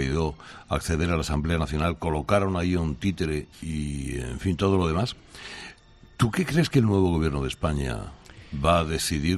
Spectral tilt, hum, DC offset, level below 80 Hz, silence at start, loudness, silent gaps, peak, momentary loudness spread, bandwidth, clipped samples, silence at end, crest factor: -6 dB/octave; none; under 0.1%; -38 dBFS; 0 s; -26 LUFS; none; -8 dBFS; 15 LU; 14 kHz; under 0.1%; 0 s; 18 dB